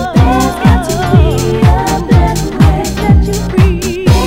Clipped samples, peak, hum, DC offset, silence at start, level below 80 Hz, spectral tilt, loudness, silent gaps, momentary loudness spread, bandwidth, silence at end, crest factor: 2%; 0 dBFS; none; under 0.1%; 0 s; -16 dBFS; -6.5 dB/octave; -10 LUFS; none; 3 LU; 16.5 kHz; 0 s; 10 dB